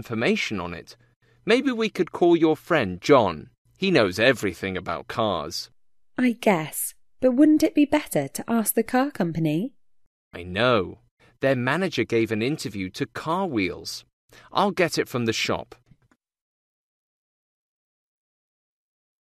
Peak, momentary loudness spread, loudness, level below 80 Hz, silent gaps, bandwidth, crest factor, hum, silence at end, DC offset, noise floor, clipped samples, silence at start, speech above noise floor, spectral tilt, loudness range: -4 dBFS; 13 LU; -23 LUFS; -58 dBFS; 1.16-1.20 s, 3.58-3.65 s, 10.06-10.31 s, 11.11-11.17 s, 14.13-14.28 s; 14 kHz; 20 dB; none; 3.6 s; under 0.1%; -66 dBFS; under 0.1%; 0 s; 43 dB; -5 dB/octave; 6 LU